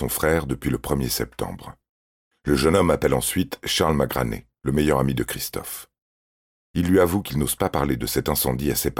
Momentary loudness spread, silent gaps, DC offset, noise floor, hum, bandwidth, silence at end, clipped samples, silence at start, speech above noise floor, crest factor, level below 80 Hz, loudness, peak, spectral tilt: 12 LU; 1.89-2.31 s, 6.02-6.74 s; under 0.1%; under -90 dBFS; none; 17.5 kHz; 0 s; under 0.1%; 0 s; over 68 dB; 16 dB; -38 dBFS; -23 LUFS; -6 dBFS; -5 dB/octave